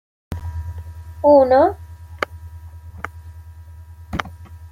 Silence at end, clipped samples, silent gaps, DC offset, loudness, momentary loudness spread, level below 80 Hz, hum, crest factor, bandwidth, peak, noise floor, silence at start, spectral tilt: 0.05 s; under 0.1%; none; under 0.1%; -18 LUFS; 27 LU; -42 dBFS; none; 20 dB; 15 kHz; -2 dBFS; -39 dBFS; 0.3 s; -7.5 dB/octave